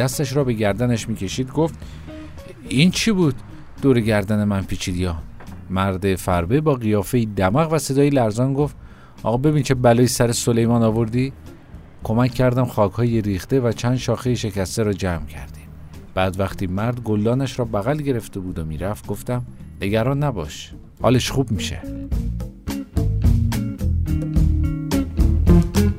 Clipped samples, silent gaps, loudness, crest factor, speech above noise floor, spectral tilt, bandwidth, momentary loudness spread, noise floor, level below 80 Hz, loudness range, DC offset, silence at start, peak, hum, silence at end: under 0.1%; none; -20 LUFS; 20 dB; 21 dB; -6 dB/octave; 16 kHz; 13 LU; -40 dBFS; -30 dBFS; 5 LU; under 0.1%; 0 s; 0 dBFS; none; 0 s